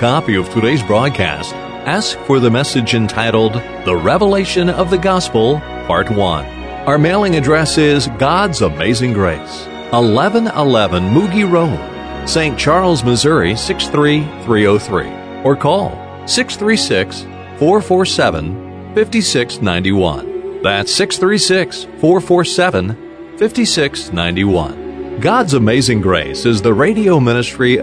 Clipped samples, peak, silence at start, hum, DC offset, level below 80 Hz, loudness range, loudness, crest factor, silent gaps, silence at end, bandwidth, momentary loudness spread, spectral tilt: under 0.1%; 0 dBFS; 0 s; none; under 0.1%; -36 dBFS; 2 LU; -14 LUFS; 14 dB; none; 0 s; 11 kHz; 10 LU; -5 dB/octave